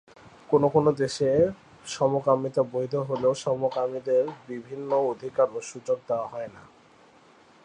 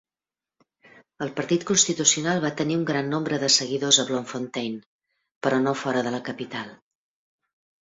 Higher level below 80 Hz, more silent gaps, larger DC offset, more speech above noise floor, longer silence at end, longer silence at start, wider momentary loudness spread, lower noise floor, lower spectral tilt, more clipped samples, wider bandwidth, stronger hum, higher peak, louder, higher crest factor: about the same, -64 dBFS vs -66 dBFS; second, none vs 4.86-4.99 s, 5.36-5.41 s; neither; second, 30 dB vs over 66 dB; about the same, 1.05 s vs 1.1 s; second, 0.25 s vs 1.2 s; about the same, 13 LU vs 14 LU; second, -56 dBFS vs under -90 dBFS; first, -6 dB/octave vs -2.5 dB/octave; neither; first, 10 kHz vs 8 kHz; neither; second, -8 dBFS vs -4 dBFS; second, -26 LUFS vs -23 LUFS; about the same, 18 dB vs 22 dB